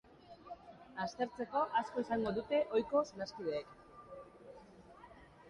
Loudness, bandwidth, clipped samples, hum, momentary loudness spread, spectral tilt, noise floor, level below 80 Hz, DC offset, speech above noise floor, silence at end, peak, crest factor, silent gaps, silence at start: -37 LUFS; 10.5 kHz; under 0.1%; none; 24 LU; -5.5 dB/octave; -58 dBFS; -68 dBFS; under 0.1%; 22 dB; 0 s; -20 dBFS; 20 dB; none; 0.2 s